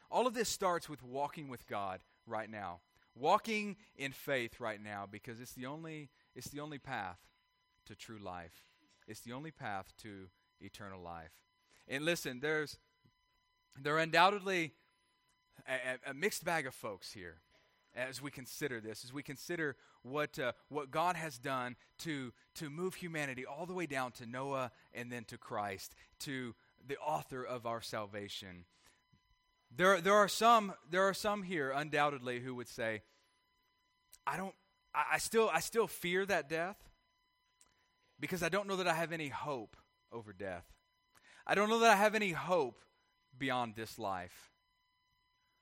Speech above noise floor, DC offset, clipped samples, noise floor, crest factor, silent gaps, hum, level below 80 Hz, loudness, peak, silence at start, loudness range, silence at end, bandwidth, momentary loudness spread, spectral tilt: 41 dB; under 0.1%; under 0.1%; -79 dBFS; 26 dB; none; none; -74 dBFS; -37 LUFS; -12 dBFS; 0.1 s; 13 LU; 1.15 s; 16.5 kHz; 19 LU; -4 dB/octave